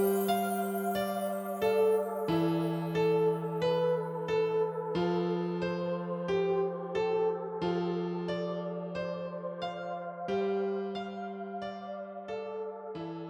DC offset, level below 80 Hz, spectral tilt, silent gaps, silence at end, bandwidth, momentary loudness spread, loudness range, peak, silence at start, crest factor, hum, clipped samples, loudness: under 0.1%; -68 dBFS; -6.5 dB/octave; none; 0 s; 19 kHz; 11 LU; 6 LU; -18 dBFS; 0 s; 14 dB; none; under 0.1%; -32 LUFS